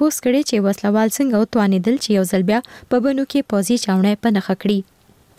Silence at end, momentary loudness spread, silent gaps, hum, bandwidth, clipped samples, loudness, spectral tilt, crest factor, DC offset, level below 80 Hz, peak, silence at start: 0.55 s; 3 LU; none; none; 16 kHz; under 0.1%; -18 LUFS; -5.5 dB/octave; 10 dB; under 0.1%; -56 dBFS; -8 dBFS; 0 s